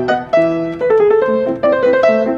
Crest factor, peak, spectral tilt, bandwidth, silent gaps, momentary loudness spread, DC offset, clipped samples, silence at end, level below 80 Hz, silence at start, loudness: 12 dB; -2 dBFS; -7 dB/octave; 7.4 kHz; none; 4 LU; under 0.1%; under 0.1%; 0 s; -50 dBFS; 0 s; -13 LUFS